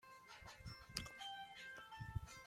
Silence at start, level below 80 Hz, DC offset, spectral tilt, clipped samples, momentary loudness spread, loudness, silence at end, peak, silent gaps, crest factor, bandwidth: 0 s; -62 dBFS; under 0.1%; -3 dB/octave; under 0.1%; 9 LU; -52 LUFS; 0 s; -20 dBFS; none; 32 dB; 16 kHz